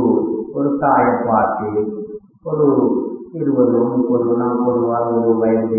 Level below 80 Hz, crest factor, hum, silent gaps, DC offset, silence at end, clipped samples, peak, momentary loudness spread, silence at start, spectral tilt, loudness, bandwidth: -54 dBFS; 14 dB; none; none; under 0.1%; 0 s; under 0.1%; -2 dBFS; 9 LU; 0 s; -16.5 dB/octave; -17 LUFS; 2.6 kHz